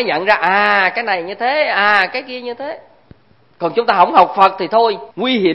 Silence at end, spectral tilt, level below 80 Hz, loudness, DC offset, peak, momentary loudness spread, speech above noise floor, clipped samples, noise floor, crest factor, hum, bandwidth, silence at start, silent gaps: 0 s; -6 dB/octave; -58 dBFS; -14 LUFS; 0.2%; 0 dBFS; 14 LU; 33 dB; under 0.1%; -47 dBFS; 16 dB; none; 9.4 kHz; 0 s; none